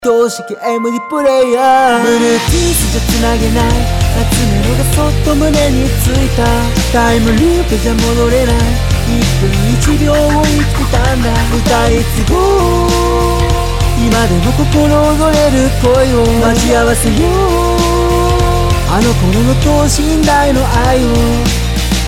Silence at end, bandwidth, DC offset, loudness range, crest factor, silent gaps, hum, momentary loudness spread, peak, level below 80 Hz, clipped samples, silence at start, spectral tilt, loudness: 0 s; 16.5 kHz; under 0.1%; 2 LU; 8 dB; none; none; 3 LU; -2 dBFS; -16 dBFS; under 0.1%; 0 s; -5 dB/octave; -11 LUFS